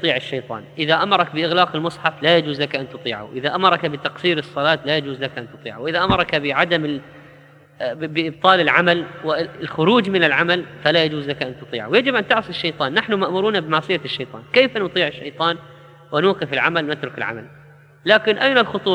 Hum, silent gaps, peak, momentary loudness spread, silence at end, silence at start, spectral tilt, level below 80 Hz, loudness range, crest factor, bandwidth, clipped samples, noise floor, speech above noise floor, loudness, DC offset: none; none; 0 dBFS; 11 LU; 0 s; 0 s; -6 dB/octave; -54 dBFS; 3 LU; 20 dB; 10 kHz; under 0.1%; -47 dBFS; 28 dB; -19 LUFS; under 0.1%